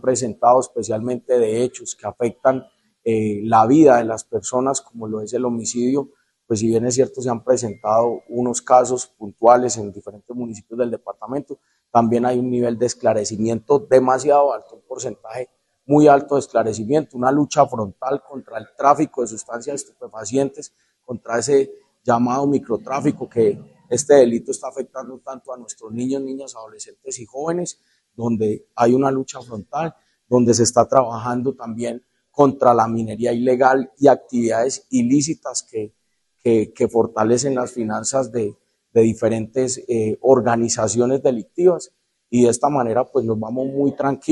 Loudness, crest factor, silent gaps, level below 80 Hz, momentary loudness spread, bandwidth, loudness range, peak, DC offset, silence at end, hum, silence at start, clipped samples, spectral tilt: -19 LUFS; 18 dB; none; -60 dBFS; 15 LU; 12 kHz; 5 LU; 0 dBFS; under 0.1%; 0 s; none; 0.05 s; under 0.1%; -5.5 dB/octave